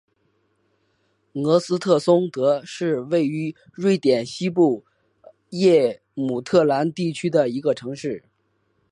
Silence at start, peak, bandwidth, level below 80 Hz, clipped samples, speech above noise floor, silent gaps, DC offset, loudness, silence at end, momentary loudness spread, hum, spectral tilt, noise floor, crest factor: 1.35 s; -4 dBFS; 11 kHz; -68 dBFS; under 0.1%; 48 dB; none; under 0.1%; -21 LUFS; 0.75 s; 12 LU; none; -6.5 dB/octave; -68 dBFS; 18 dB